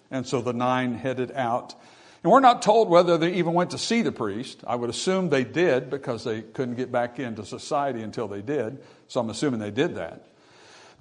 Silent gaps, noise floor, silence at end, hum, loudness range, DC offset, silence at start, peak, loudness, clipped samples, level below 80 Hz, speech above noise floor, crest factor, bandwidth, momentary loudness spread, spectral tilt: none; -52 dBFS; 0.85 s; none; 8 LU; under 0.1%; 0.1 s; -4 dBFS; -24 LUFS; under 0.1%; -68 dBFS; 28 dB; 22 dB; 11 kHz; 14 LU; -5.5 dB/octave